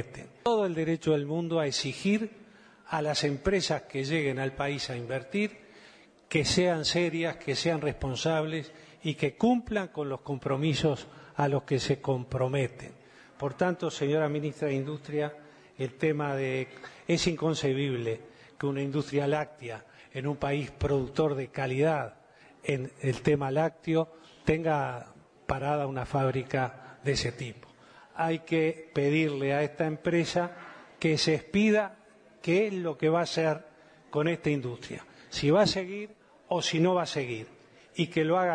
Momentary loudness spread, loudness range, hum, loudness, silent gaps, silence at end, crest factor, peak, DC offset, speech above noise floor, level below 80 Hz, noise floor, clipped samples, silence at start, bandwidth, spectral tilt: 11 LU; 3 LU; none; -30 LUFS; none; 0 s; 18 dB; -12 dBFS; under 0.1%; 27 dB; -56 dBFS; -56 dBFS; under 0.1%; 0 s; 10.5 kHz; -5.5 dB/octave